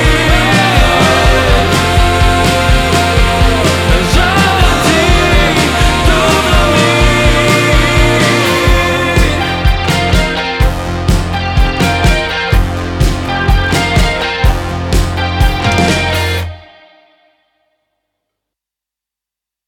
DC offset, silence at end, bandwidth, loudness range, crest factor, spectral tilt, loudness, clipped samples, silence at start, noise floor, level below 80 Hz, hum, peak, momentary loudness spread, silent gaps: under 0.1%; 3.05 s; 17 kHz; 6 LU; 10 dB; -4.5 dB/octave; -10 LUFS; under 0.1%; 0 s; -85 dBFS; -16 dBFS; 50 Hz at -25 dBFS; 0 dBFS; 5 LU; none